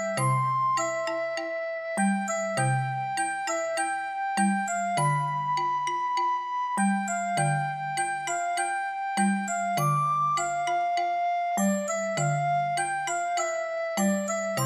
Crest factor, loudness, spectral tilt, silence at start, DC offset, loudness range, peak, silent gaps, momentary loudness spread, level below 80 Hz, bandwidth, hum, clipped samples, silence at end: 14 dB; -27 LUFS; -4.5 dB/octave; 0 s; under 0.1%; 1 LU; -14 dBFS; none; 4 LU; -74 dBFS; 15 kHz; none; under 0.1%; 0 s